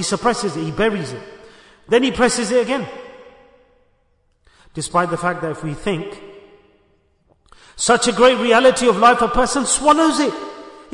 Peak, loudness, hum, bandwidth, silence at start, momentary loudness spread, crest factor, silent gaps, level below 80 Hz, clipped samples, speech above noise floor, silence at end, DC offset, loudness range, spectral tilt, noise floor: -2 dBFS; -17 LUFS; none; 11 kHz; 0 s; 19 LU; 16 dB; none; -42 dBFS; under 0.1%; 45 dB; 0.15 s; under 0.1%; 10 LU; -3.5 dB/octave; -61 dBFS